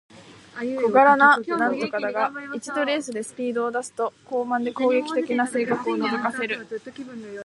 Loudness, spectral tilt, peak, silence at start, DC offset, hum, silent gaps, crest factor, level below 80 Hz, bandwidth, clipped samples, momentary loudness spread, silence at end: -23 LUFS; -4 dB/octave; -4 dBFS; 0.15 s; under 0.1%; none; none; 20 dB; -72 dBFS; 11.5 kHz; under 0.1%; 16 LU; 0 s